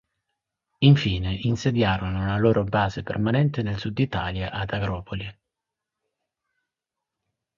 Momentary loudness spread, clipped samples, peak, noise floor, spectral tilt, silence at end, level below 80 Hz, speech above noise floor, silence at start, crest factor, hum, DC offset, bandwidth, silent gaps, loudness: 10 LU; under 0.1%; -4 dBFS; -86 dBFS; -7 dB/octave; 2.25 s; -44 dBFS; 63 dB; 0.8 s; 22 dB; none; under 0.1%; 7.2 kHz; none; -24 LUFS